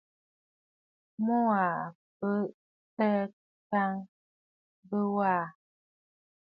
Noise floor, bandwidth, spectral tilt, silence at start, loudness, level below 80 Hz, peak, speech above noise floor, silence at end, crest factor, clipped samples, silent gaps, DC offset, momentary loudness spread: under -90 dBFS; 5 kHz; -10.5 dB/octave; 1.2 s; -31 LUFS; -80 dBFS; -14 dBFS; over 61 dB; 1.05 s; 18 dB; under 0.1%; 1.95-2.20 s, 2.54-2.97 s, 3.33-3.70 s, 4.09-4.83 s; under 0.1%; 13 LU